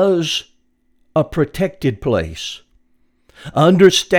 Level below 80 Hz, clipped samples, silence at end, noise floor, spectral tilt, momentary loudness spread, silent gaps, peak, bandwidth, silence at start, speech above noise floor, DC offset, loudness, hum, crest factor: -42 dBFS; under 0.1%; 0 s; -59 dBFS; -5 dB/octave; 17 LU; none; 0 dBFS; 17 kHz; 0 s; 44 dB; under 0.1%; -17 LUFS; none; 18 dB